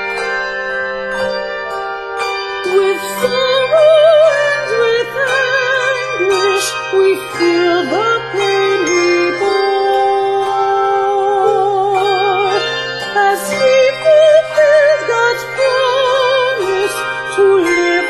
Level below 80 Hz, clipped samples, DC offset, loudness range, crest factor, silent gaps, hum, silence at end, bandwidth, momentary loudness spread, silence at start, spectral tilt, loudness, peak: -52 dBFS; under 0.1%; under 0.1%; 2 LU; 12 dB; none; none; 0 s; 13.5 kHz; 9 LU; 0 s; -3 dB/octave; -13 LUFS; 0 dBFS